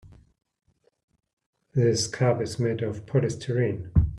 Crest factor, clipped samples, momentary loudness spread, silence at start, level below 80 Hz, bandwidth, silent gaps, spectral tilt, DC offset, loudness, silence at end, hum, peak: 20 dB; under 0.1%; 4 LU; 0.05 s; -40 dBFS; 11.5 kHz; 1.03-1.08 s, 1.33-1.37 s, 1.46-1.53 s; -6 dB/octave; under 0.1%; -26 LUFS; 0 s; none; -8 dBFS